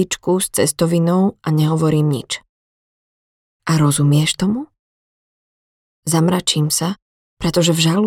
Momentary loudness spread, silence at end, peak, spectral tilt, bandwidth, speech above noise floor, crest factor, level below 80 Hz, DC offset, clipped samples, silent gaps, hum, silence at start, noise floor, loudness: 11 LU; 0 s; -2 dBFS; -5 dB/octave; 16.5 kHz; over 74 dB; 16 dB; -48 dBFS; under 0.1%; under 0.1%; 2.49-3.60 s, 4.79-6.03 s, 7.02-7.37 s; none; 0 s; under -90 dBFS; -17 LUFS